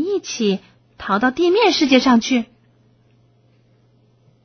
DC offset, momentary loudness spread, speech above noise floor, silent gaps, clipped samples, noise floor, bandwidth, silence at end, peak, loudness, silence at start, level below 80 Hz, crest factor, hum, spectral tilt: under 0.1%; 12 LU; 40 dB; none; under 0.1%; -56 dBFS; 6.6 kHz; 2 s; 0 dBFS; -17 LUFS; 0 s; -56 dBFS; 20 dB; none; -4 dB/octave